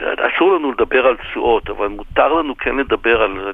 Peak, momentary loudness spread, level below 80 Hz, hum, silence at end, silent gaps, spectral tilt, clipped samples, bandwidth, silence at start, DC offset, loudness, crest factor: -2 dBFS; 6 LU; -38 dBFS; none; 0 s; none; -7 dB/octave; under 0.1%; 3.9 kHz; 0 s; under 0.1%; -16 LUFS; 16 dB